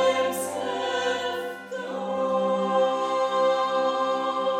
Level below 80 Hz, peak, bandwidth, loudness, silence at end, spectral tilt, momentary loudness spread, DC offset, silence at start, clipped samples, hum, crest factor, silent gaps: -74 dBFS; -12 dBFS; 16 kHz; -25 LUFS; 0 s; -3.5 dB/octave; 8 LU; under 0.1%; 0 s; under 0.1%; none; 14 dB; none